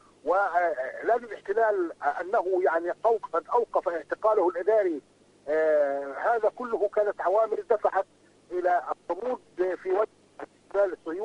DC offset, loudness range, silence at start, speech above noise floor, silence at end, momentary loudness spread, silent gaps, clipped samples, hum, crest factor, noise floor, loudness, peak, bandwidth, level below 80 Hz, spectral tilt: under 0.1%; 3 LU; 0.25 s; 20 dB; 0 s; 8 LU; none; under 0.1%; 50 Hz at -70 dBFS; 16 dB; -46 dBFS; -27 LUFS; -10 dBFS; 10 kHz; -70 dBFS; -5.5 dB/octave